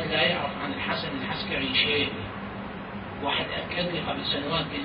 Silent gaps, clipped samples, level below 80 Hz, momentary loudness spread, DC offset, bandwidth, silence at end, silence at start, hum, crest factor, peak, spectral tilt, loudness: none; under 0.1%; -50 dBFS; 13 LU; under 0.1%; 5.4 kHz; 0 s; 0 s; none; 20 dB; -10 dBFS; -9 dB/octave; -28 LUFS